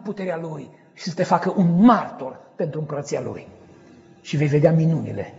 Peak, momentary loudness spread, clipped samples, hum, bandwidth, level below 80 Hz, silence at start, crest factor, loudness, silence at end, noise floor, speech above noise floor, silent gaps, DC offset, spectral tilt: -4 dBFS; 19 LU; under 0.1%; none; 7.8 kHz; -60 dBFS; 0 s; 18 dB; -21 LUFS; 0 s; -48 dBFS; 28 dB; none; under 0.1%; -7.5 dB/octave